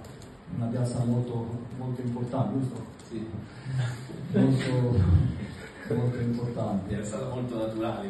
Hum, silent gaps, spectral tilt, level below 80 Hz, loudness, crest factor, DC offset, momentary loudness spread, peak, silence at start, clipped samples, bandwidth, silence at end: none; none; -8 dB/octave; -46 dBFS; -29 LUFS; 18 dB; under 0.1%; 15 LU; -10 dBFS; 0 s; under 0.1%; 11.5 kHz; 0 s